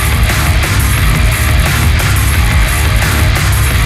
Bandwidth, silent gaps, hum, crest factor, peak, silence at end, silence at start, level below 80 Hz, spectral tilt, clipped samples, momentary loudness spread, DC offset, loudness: 16 kHz; none; none; 10 dB; 0 dBFS; 0 s; 0 s; -14 dBFS; -4 dB/octave; under 0.1%; 1 LU; under 0.1%; -11 LUFS